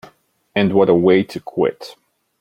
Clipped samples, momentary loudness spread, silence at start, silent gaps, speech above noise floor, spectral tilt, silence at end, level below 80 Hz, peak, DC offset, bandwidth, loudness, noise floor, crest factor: under 0.1%; 16 LU; 0.55 s; none; 37 dB; -7.5 dB/octave; 0.5 s; -56 dBFS; -2 dBFS; under 0.1%; 12 kHz; -16 LUFS; -53 dBFS; 16 dB